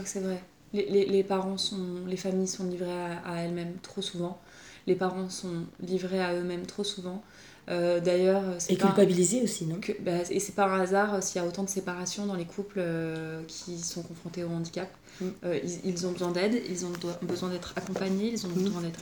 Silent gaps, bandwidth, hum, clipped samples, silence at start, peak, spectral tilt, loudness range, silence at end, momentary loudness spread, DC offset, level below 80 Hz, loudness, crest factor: none; over 20 kHz; none; under 0.1%; 0 s; -10 dBFS; -5 dB/octave; 7 LU; 0 s; 12 LU; under 0.1%; -66 dBFS; -30 LUFS; 20 dB